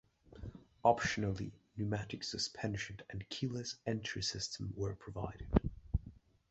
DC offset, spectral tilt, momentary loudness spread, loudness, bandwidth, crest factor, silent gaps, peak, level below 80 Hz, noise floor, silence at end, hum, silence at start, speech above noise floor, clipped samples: under 0.1%; -4.5 dB/octave; 13 LU; -39 LUFS; 8.2 kHz; 26 dB; none; -12 dBFS; -48 dBFS; -58 dBFS; 0.35 s; none; 0.3 s; 20 dB; under 0.1%